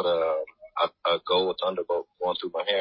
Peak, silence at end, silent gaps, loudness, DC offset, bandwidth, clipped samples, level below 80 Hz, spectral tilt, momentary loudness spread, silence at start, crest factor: -10 dBFS; 0 s; none; -27 LUFS; under 0.1%; 5.6 kHz; under 0.1%; -66 dBFS; -7.5 dB/octave; 7 LU; 0 s; 16 dB